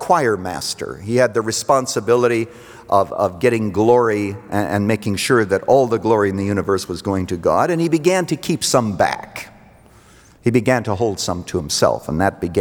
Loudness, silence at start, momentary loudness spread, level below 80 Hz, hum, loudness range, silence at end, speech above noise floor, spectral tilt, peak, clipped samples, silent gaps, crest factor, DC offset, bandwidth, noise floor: -18 LUFS; 0 s; 8 LU; -50 dBFS; none; 3 LU; 0 s; 30 dB; -5 dB/octave; -2 dBFS; under 0.1%; none; 16 dB; under 0.1%; over 20 kHz; -47 dBFS